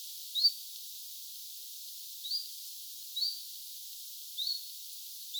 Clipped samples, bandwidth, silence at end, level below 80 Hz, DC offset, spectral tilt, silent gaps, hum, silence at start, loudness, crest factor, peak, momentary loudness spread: under 0.1%; over 20 kHz; 0 s; under -90 dBFS; under 0.1%; 10.5 dB/octave; none; none; 0 s; -36 LUFS; 22 dB; -16 dBFS; 14 LU